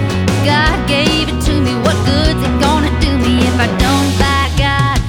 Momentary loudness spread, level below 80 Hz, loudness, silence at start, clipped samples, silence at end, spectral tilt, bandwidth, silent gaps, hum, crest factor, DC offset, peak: 2 LU; -20 dBFS; -13 LUFS; 0 s; under 0.1%; 0 s; -5 dB/octave; 17.5 kHz; none; none; 12 dB; under 0.1%; -2 dBFS